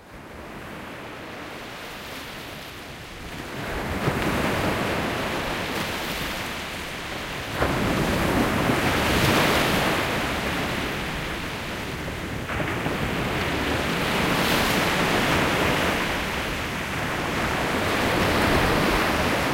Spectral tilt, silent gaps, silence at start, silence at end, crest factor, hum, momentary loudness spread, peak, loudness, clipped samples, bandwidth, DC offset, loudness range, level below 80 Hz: -4.5 dB/octave; none; 0 s; 0 s; 20 dB; none; 15 LU; -6 dBFS; -24 LUFS; under 0.1%; 16 kHz; under 0.1%; 7 LU; -38 dBFS